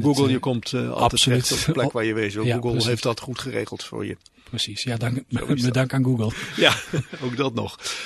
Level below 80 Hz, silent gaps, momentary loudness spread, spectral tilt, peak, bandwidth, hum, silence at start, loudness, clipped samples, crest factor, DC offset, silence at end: -48 dBFS; none; 11 LU; -4.5 dB/octave; 0 dBFS; 12.5 kHz; none; 0 s; -23 LUFS; under 0.1%; 22 dB; under 0.1%; 0 s